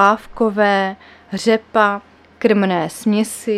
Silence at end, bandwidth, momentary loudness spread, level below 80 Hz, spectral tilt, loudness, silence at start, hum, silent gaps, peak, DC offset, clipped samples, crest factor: 0 s; 14.5 kHz; 9 LU; -54 dBFS; -5 dB/octave; -17 LUFS; 0 s; none; none; 0 dBFS; under 0.1%; under 0.1%; 16 dB